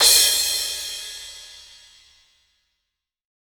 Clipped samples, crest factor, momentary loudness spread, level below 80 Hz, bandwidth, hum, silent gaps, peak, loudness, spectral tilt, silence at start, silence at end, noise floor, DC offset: under 0.1%; 22 dB; 25 LU; -56 dBFS; over 20 kHz; none; none; -2 dBFS; -18 LUFS; 3 dB/octave; 0 s; 1.8 s; -81 dBFS; under 0.1%